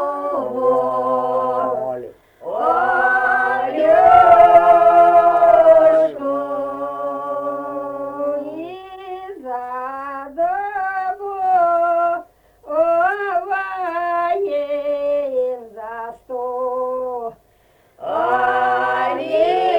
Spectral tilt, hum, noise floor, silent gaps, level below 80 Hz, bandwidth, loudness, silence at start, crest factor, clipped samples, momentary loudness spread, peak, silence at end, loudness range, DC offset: -5.5 dB/octave; none; -55 dBFS; none; -54 dBFS; 5.4 kHz; -17 LUFS; 0 s; 16 dB; under 0.1%; 18 LU; 0 dBFS; 0 s; 14 LU; under 0.1%